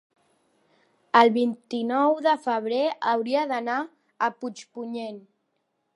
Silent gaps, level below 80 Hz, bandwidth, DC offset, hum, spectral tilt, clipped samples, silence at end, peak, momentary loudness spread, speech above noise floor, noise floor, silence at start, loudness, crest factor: none; -84 dBFS; 11 kHz; under 0.1%; none; -5 dB/octave; under 0.1%; 0.75 s; -2 dBFS; 17 LU; 51 dB; -75 dBFS; 1.15 s; -24 LUFS; 24 dB